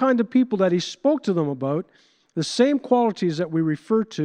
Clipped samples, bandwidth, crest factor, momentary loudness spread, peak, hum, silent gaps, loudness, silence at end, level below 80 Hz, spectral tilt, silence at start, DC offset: under 0.1%; 10 kHz; 16 dB; 8 LU; -4 dBFS; none; none; -22 LUFS; 0 s; -74 dBFS; -6 dB/octave; 0 s; under 0.1%